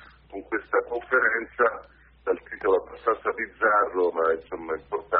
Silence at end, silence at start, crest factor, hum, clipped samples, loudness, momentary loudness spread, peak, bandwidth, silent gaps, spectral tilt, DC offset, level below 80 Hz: 0 s; 0.3 s; 18 dB; none; under 0.1%; -26 LUFS; 11 LU; -8 dBFS; 4.6 kHz; none; -2.5 dB/octave; under 0.1%; -58 dBFS